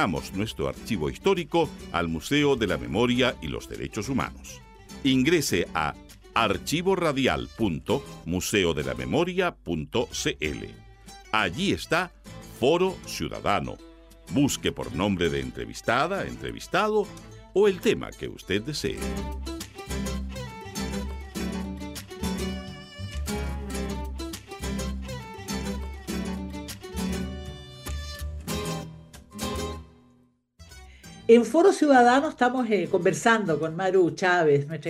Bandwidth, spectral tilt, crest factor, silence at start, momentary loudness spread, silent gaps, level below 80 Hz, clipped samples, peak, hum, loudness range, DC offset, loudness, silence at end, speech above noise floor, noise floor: 16 kHz; -5 dB/octave; 22 dB; 0 s; 15 LU; none; -42 dBFS; under 0.1%; -4 dBFS; none; 12 LU; under 0.1%; -26 LUFS; 0 s; 37 dB; -62 dBFS